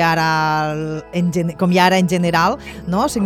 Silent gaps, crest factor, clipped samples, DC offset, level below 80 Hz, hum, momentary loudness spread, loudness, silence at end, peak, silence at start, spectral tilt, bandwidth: none; 16 dB; under 0.1%; under 0.1%; -44 dBFS; none; 9 LU; -17 LUFS; 0 s; 0 dBFS; 0 s; -5.5 dB/octave; 15 kHz